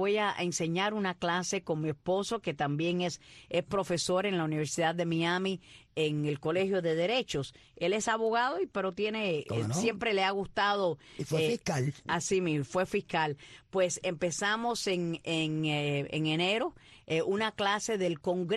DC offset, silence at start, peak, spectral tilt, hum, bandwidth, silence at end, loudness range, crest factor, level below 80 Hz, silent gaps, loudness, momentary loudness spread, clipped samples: under 0.1%; 0 s; -16 dBFS; -4.5 dB/octave; none; 12.5 kHz; 0 s; 1 LU; 16 dB; -64 dBFS; none; -31 LUFS; 5 LU; under 0.1%